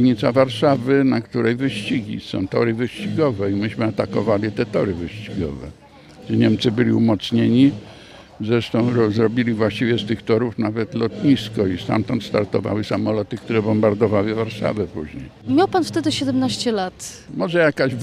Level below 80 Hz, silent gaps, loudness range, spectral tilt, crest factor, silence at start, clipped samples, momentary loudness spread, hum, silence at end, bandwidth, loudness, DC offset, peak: -50 dBFS; none; 3 LU; -6.5 dB/octave; 16 dB; 0 s; under 0.1%; 10 LU; none; 0 s; 13 kHz; -20 LUFS; under 0.1%; -2 dBFS